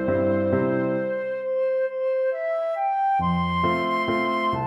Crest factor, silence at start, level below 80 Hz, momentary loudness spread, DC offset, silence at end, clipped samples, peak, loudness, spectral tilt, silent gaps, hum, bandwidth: 14 dB; 0 s; -52 dBFS; 4 LU; under 0.1%; 0 s; under 0.1%; -10 dBFS; -24 LUFS; -8 dB/octave; none; none; 11 kHz